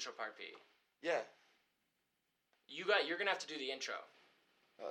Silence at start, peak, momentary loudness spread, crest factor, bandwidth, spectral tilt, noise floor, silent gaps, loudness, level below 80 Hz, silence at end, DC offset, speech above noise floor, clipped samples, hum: 0 s; -20 dBFS; 17 LU; 24 dB; 13.5 kHz; -1.5 dB/octave; -85 dBFS; none; -40 LUFS; under -90 dBFS; 0 s; under 0.1%; 44 dB; under 0.1%; none